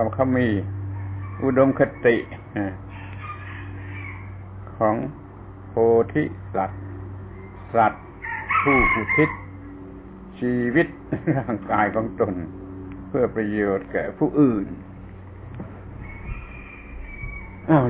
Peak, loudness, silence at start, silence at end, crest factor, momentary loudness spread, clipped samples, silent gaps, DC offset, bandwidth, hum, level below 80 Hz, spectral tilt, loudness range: -4 dBFS; -23 LUFS; 0 s; 0 s; 20 dB; 20 LU; under 0.1%; none; under 0.1%; 4 kHz; none; -42 dBFS; -11 dB/octave; 5 LU